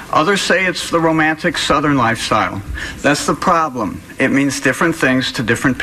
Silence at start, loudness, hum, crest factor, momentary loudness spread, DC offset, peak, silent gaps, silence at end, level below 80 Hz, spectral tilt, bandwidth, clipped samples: 0 s; -15 LUFS; none; 14 dB; 6 LU; under 0.1%; -2 dBFS; none; 0 s; -38 dBFS; -4 dB/octave; 15 kHz; under 0.1%